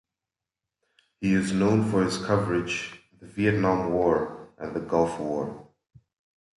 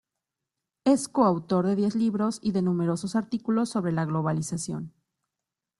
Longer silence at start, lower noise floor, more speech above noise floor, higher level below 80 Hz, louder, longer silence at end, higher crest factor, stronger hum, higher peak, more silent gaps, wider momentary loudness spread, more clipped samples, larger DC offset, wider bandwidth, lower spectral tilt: first, 1.2 s vs 0.85 s; about the same, -89 dBFS vs -87 dBFS; about the same, 64 dB vs 62 dB; first, -54 dBFS vs -64 dBFS; about the same, -26 LUFS vs -26 LUFS; about the same, 0.95 s vs 0.9 s; about the same, 18 dB vs 20 dB; neither; about the same, -8 dBFS vs -8 dBFS; neither; first, 13 LU vs 7 LU; neither; neither; about the same, 11.5 kHz vs 12 kHz; about the same, -6.5 dB/octave vs -6.5 dB/octave